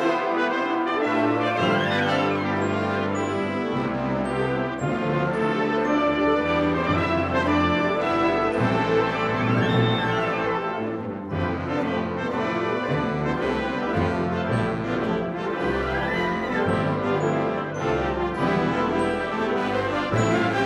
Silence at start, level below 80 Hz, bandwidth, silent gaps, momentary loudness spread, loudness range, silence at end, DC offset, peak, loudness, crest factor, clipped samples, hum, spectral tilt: 0 s; -46 dBFS; 11.5 kHz; none; 5 LU; 3 LU; 0 s; under 0.1%; -8 dBFS; -24 LUFS; 16 dB; under 0.1%; none; -6.5 dB/octave